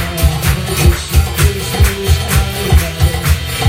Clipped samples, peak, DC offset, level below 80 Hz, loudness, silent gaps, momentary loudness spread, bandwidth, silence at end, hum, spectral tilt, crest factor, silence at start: under 0.1%; 0 dBFS; under 0.1%; -16 dBFS; -13 LUFS; none; 3 LU; 16.5 kHz; 0 s; none; -4.5 dB/octave; 12 dB; 0 s